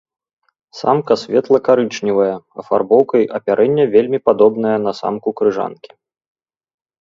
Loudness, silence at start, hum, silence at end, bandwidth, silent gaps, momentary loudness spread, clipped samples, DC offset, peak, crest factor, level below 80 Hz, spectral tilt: -15 LUFS; 0.75 s; none; 1.3 s; 7.4 kHz; none; 8 LU; under 0.1%; under 0.1%; 0 dBFS; 16 dB; -60 dBFS; -6.5 dB/octave